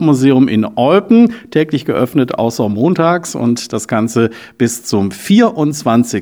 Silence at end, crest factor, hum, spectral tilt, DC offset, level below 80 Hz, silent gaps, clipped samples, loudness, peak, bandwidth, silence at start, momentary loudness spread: 0 s; 12 dB; none; -6 dB/octave; under 0.1%; -56 dBFS; none; under 0.1%; -13 LUFS; 0 dBFS; 18 kHz; 0 s; 7 LU